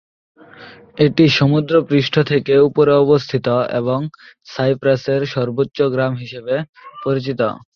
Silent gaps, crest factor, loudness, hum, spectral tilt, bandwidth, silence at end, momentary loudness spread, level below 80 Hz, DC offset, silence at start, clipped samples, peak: 6.69-6.73 s; 16 dB; -16 LUFS; none; -7.5 dB/octave; 6.8 kHz; 0.15 s; 10 LU; -54 dBFS; under 0.1%; 0.6 s; under 0.1%; -2 dBFS